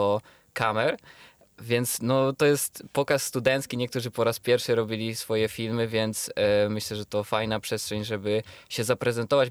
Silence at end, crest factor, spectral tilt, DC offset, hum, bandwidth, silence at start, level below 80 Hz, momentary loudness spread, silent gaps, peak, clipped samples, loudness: 0 s; 18 dB; -4.5 dB/octave; under 0.1%; none; over 20 kHz; 0 s; -62 dBFS; 7 LU; none; -10 dBFS; under 0.1%; -26 LUFS